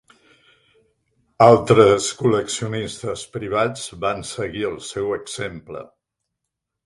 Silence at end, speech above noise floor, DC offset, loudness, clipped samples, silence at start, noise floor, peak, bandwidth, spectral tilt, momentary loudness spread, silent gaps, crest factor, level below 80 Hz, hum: 1 s; 62 dB; under 0.1%; -20 LUFS; under 0.1%; 1.4 s; -81 dBFS; 0 dBFS; 11.5 kHz; -5 dB/octave; 16 LU; none; 20 dB; -52 dBFS; none